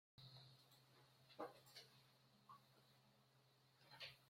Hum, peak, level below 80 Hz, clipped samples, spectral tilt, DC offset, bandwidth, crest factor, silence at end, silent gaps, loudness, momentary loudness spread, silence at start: none; -40 dBFS; under -90 dBFS; under 0.1%; -4 dB/octave; under 0.1%; 16 kHz; 26 dB; 0 s; none; -62 LUFS; 11 LU; 0.15 s